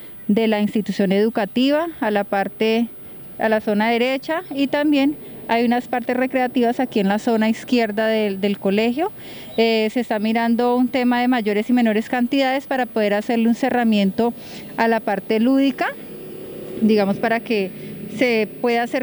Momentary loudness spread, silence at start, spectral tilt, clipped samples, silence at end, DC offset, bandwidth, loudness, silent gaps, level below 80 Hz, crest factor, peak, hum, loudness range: 7 LU; 0 s; -6.5 dB/octave; under 0.1%; 0 s; under 0.1%; over 20 kHz; -19 LUFS; none; -60 dBFS; 14 dB; -6 dBFS; none; 2 LU